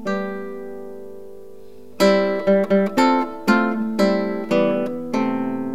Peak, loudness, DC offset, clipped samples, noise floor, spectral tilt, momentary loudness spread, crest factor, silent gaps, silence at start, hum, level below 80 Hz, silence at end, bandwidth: -4 dBFS; -20 LUFS; 1%; under 0.1%; -43 dBFS; -6 dB/octave; 18 LU; 16 dB; none; 0 s; none; -64 dBFS; 0 s; 16 kHz